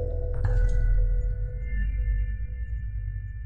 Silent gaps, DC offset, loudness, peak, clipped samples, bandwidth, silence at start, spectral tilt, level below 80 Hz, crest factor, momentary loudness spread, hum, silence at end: none; under 0.1%; -30 LUFS; -14 dBFS; under 0.1%; 2.9 kHz; 0 s; -8.5 dB/octave; -26 dBFS; 12 dB; 8 LU; none; 0 s